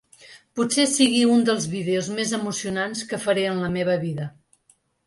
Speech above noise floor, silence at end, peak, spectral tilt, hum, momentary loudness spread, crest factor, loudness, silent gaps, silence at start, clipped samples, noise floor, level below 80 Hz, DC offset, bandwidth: 41 dB; 0.8 s; -6 dBFS; -4 dB/octave; none; 9 LU; 18 dB; -22 LUFS; none; 0.2 s; under 0.1%; -63 dBFS; -60 dBFS; under 0.1%; 11.5 kHz